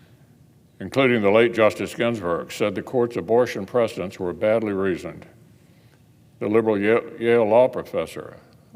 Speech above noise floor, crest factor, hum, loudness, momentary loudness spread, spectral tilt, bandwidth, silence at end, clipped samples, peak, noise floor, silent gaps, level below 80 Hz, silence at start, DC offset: 32 dB; 18 dB; none; -21 LUFS; 12 LU; -6 dB/octave; 16 kHz; 0.4 s; under 0.1%; -4 dBFS; -54 dBFS; none; -60 dBFS; 0.8 s; under 0.1%